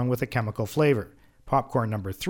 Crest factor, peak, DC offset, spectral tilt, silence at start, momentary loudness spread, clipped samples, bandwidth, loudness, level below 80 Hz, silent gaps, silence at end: 16 dB; -10 dBFS; under 0.1%; -7 dB/octave; 0 s; 6 LU; under 0.1%; 19.5 kHz; -26 LUFS; -52 dBFS; none; 0 s